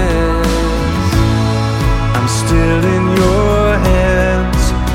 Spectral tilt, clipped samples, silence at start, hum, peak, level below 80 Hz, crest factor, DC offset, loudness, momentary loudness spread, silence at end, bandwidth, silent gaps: -6 dB/octave; under 0.1%; 0 s; none; 0 dBFS; -18 dBFS; 12 dB; under 0.1%; -13 LUFS; 3 LU; 0 s; 16 kHz; none